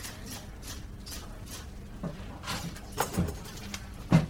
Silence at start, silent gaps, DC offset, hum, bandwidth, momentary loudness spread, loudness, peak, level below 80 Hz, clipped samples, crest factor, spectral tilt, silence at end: 0 s; none; under 0.1%; none; over 20 kHz; 11 LU; -37 LUFS; -10 dBFS; -44 dBFS; under 0.1%; 24 dB; -5.5 dB/octave; 0 s